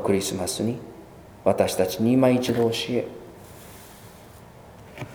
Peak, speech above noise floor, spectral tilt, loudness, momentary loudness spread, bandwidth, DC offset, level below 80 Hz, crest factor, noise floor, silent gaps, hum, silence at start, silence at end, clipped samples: -4 dBFS; 24 dB; -5 dB/octave; -23 LUFS; 24 LU; over 20 kHz; under 0.1%; -56 dBFS; 20 dB; -46 dBFS; none; none; 0 s; 0 s; under 0.1%